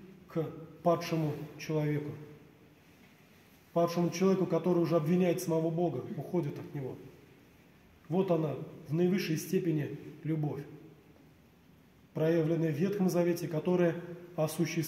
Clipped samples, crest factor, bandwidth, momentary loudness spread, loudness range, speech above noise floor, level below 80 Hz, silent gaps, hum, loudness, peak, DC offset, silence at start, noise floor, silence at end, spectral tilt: under 0.1%; 16 dB; 16 kHz; 12 LU; 5 LU; 29 dB; -70 dBFS; none; none; -32 LUFS; -16 dBFS; under 0.1%; 0 s; -61 dBFS; 0 s; -7 dB/octave